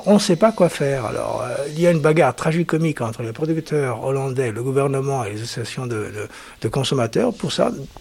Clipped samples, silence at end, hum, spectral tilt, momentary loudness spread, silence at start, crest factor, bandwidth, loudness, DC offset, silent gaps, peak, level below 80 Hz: under 0.1%; 0 s; none; -6 dB/octave; 11 LU; 0 s; 16 dB; 16 kHz; -20 LUFS; under 0.1%; none; -2 dBFS; -50 dBFS